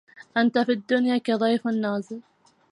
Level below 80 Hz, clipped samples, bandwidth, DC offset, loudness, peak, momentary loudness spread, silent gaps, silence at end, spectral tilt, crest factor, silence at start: -76 dBFS; under 0.1%; 10 kHz; under 0.1%; -24 LUFS; -8 dBFS; 9 LU; none; 0.5 s; -6 dB/octave; 16 dB; 0.15 s